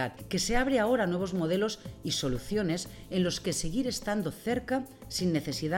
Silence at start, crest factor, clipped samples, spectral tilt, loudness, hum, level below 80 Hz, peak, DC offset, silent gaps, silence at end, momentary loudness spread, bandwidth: 0 s; 16 dB; under 0.1%; -4.5 dB/octave; -31 LUFS; none; -46 dBFS; -14 dBFS; under 0.1%; none; 0 s; 7 LU; 17 kHz